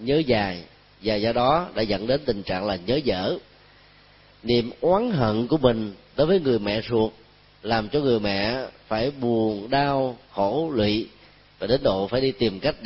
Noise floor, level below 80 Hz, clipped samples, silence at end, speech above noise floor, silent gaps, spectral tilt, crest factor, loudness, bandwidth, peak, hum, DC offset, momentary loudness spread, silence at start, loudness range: -53 dBFS; -48 dBFS; under 0.1%; 0 s; 30 dB; none; -10 dB/octave; 20 dB; -24 LUFS; 5.8 kHz; -4 dBFS; 50 Hz at -55 dBFS; under 0.1%; 8 LU; 0 s; 2 LU